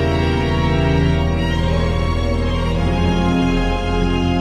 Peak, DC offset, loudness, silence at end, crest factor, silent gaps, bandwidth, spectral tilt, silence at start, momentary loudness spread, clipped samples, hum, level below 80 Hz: -4 dBFS; under 0.1%; -18 LUFS; 0 s; 12 dB; none; 10 kHz; -7 dB/octave; 0 s; 3 LU; under 0.1%; none; -22 dBFS